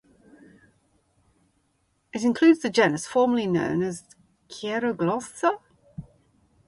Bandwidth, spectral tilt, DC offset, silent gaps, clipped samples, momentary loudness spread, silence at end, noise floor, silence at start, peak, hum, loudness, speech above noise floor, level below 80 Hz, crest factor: 11.5 kHz; -5.5 dB/octave; under 0.1%; none; under 0.1%; 24 LU; 0.65 s; -70 dBFS; 2.15 s; -6 dBFS; none; -24 LUFS; 47 dB; -62 dBFS; 20 dB